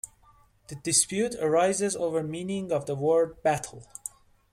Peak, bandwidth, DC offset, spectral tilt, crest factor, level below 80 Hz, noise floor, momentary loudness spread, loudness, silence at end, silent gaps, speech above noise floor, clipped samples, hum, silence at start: -8 dBFS; 16 kHz; under 0.1%; -3.5 dB/octave; 20 dB; -62 dBFS; -60 dBFS; 17 LU; -26 LUFS; 0.45 s; none; 33 dB; under 0.1%; none; 0.05 s